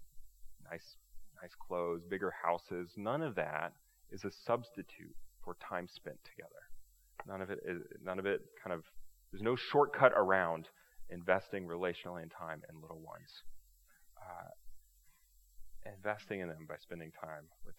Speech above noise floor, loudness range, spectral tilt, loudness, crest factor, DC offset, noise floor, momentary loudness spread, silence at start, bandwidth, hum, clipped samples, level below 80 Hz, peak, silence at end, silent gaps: 28 dB; 15 LU; -6 dB/octave; -38 LUFS; 30 dB; under 0.1%; -67 dBFS; 23 LU; 0 s; 17.5 kHz; none; under 0.1%; -64 dBFS; -10 dBFS; 0.05 s; none